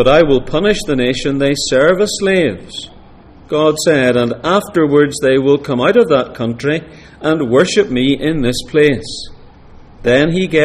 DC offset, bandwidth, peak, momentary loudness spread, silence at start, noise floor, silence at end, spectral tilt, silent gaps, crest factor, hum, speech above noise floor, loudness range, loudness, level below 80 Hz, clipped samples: under 0.1%; 15 kHz; 0 dBFS; 9 LU; 0 s; -39 dBFS; 0 s; -5 dB/octave; none; 14 dB; none; 26 dB; 2 LU; -13 LUFS; -36 dBFS; under 0.1%